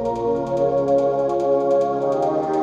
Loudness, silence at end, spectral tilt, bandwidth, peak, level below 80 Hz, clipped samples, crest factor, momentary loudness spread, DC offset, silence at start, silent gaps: -20 LUFS; 0 s; -8 dB/octave; 8 kHz; -8 dBFS; -50 dBFS; under 0.1%; 12 dB; 3 LU; under 0.1%; 0 s; none